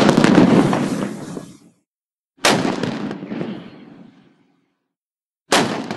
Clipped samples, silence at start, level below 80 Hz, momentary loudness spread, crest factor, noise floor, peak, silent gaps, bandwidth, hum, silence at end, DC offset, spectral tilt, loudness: under 0.1%; 0 s; -52 dBFS; 19 LU; 20 dB; under -90 dBFS; 0 dBFS; 1.88-1.93 s, 2.05-2.31 s, 4.96-5.15 s, 5.26-5.30 s, 5.41-5.45 s; 12.5 kHz; none; 0 s; under 0.1%; -5 dB/octave; -17 LUFS